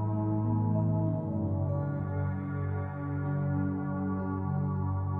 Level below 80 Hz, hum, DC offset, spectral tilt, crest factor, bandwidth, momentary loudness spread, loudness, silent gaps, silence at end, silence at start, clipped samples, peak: -56 dBFS; none; under 0.1%; -13 dB/octave; 12 dB; 2.6 kHz; 5 LU; -32 LUFS; none; 0 s; 0 s; under 0.1%; -18 dBFS